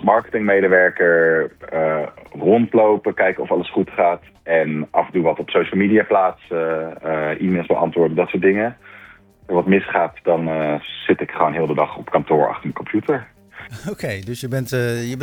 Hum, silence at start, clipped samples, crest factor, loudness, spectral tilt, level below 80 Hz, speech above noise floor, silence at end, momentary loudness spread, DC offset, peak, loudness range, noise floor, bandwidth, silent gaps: none; 0 s; under 0.1%; 18 dB; -19 LUFS; -7 dB/octave; -56 dBFS; 27 dB; 0 s; 10 LU; under 0.1%; 0 dBFS; 4 LU; -45 dBFS; 18 kHz; none